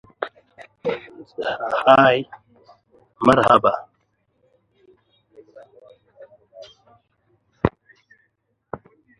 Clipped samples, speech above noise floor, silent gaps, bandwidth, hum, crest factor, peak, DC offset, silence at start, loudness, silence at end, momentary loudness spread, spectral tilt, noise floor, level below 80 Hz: under 0.1%; 53 dB; none; 11.5 kHz; none; 24 dB; 0 dBFS; under 0.1%; 0.2 s; -19 LUFS; 0.45 s; 24 LU; -6.5 dB/octave; -70 dBFS; -52 dBFS